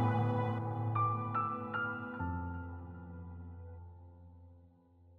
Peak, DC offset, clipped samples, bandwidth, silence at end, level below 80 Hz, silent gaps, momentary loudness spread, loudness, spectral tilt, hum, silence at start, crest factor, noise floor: -20 dBFS; under 0.1%; under 0.1%; 4.2 kHz; 0 s; -64 dBFS; none; 21 LU; -37 LUFS; -10 dB/octave; none; 0 s; 18 dB; -63 dBFS